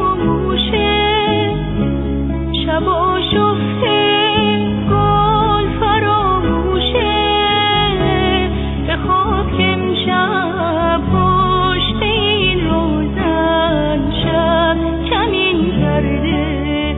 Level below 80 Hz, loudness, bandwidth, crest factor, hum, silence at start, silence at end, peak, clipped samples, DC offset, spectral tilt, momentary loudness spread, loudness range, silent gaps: -26 dBFS; -15 LUFS; 4.1 kHz; 14 dB; none; 0 s; 0 s; -2 dBFS; under 0.1%; under 0.1%; -9 dB/octave; 5 LU; 2 LU; none